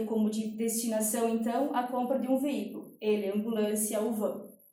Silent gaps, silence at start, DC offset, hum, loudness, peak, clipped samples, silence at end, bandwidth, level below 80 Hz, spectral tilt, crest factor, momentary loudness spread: none; 0 s; under 0.1%; none; -31 LUFS; -16 dBFS; under 0.1%; 0.15 s; 16.5 kHz; -78 dBFS; -4.5 dB/octave; 14 dB; 6 LU